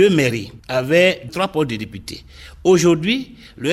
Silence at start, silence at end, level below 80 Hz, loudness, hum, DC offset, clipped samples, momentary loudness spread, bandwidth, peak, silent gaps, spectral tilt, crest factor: 0 s; 0 s; -46 dBFS; -18 LUFS; none; under 0.1%; under 0.1%; 18 LU; 15.5 kHz; 0 dBFS; none; -5 dB/octave; 16 dB